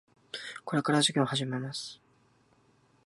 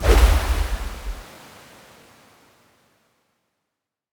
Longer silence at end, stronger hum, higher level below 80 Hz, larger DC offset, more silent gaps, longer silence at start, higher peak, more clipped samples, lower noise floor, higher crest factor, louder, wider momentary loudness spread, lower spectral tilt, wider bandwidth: second, 1.1 s vs 2.9 s; neither; second, -76 dBFS vs -24 dBFS; neither; neither; first, 0.35 s vs 0 s; second, -12 dBFS vs -2 dBFS; neither; second, -66 dBFS vs -83 dBFS; about the same, 22 dB vs 20 dB; second, -30 LUFS vs -22 LUFS; second, 16 LU vs 27 LU; about the same, -4 dB/octave vs -5 dB/octave; second, 11.5 kHz vs over 20 kHz